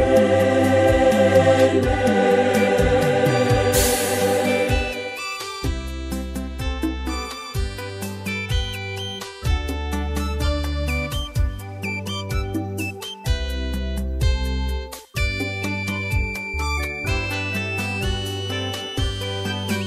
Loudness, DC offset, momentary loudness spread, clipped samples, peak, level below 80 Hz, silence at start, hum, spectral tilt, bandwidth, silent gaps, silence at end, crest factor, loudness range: -22 LUFS; under 0.1%; 12 LU; under 0.1%; -2 dBFS; -28 dBFS; 0 s; none; -5 dB/octave; 16 kHz; none; 0 s; 18 dB; 10 LU